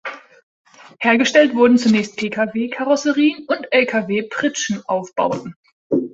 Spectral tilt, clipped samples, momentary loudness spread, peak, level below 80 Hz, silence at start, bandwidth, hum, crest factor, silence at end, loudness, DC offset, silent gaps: -4 dB/octave; under 0.1%; 10 LU; -2 dBFS; -62 dBFS; 0.05 s; 8 kHz; none; 16 dB; 0.05 s; -17 LUFS; under 0.1%; 0.43-0.65 s, 5.56-5.63 s, 5.72-5.90 s